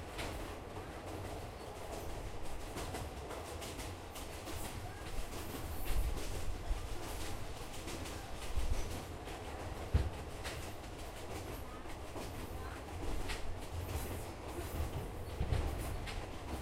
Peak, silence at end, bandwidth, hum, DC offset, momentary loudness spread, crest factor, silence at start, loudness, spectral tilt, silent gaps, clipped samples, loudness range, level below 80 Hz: -18 dBFS; 0 s; 16 kHz; none; under 0.1%; 6 LU; 22 dB; 0 s; -44 LUFS; -5 dB/octave; none; under 0.1%; 3 LU; -44 dBFS